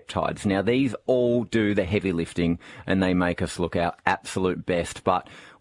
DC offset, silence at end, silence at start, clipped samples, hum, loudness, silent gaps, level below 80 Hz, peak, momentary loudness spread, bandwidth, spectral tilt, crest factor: under 0.1%; 0.1 s; 0.1 s; under 0.1%; none; -25 LUFS; none; -52 dBFS; -2 dBFS; 5 LU; 11.5 kHz; -6 dB/octave; 22 dB